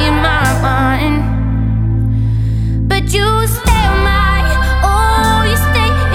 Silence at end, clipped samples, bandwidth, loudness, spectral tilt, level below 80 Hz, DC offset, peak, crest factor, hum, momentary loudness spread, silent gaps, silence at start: 0 s; under 0.1%; 17 kHz; -13 LUFS; -5.5 dB/octave; -16 dBFS; under 0.1%; 0 dBFS; 12 dB; none; 4 LU; none; 0 s